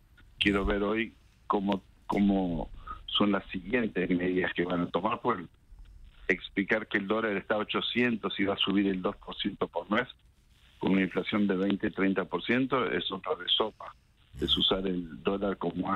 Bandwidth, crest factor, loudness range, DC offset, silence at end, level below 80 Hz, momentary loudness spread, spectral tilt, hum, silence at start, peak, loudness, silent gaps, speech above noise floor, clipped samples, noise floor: 9.6 kHz; 20 dB; 2 LU; under 0.1%; 0 s; -50 dBFS; 8 LU; -6.5 dB/octave; none; 0.4 s; -10 dBFS; -30 LUFS; none; 31 dB; under 0.1%; -61 dBFS